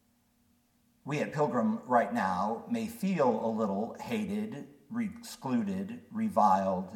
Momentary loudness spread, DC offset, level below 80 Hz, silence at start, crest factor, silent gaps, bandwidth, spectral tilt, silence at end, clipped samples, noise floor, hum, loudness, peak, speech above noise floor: 11 LU; under 0.1%; -72 dBFS; 1.05 s; 20 dB; none; 17 kHz; -6.5 dB/octave; 0 s; under 0.1%; -70 dBFS; none; -31 LUFS; -12 dBFS; 39 dB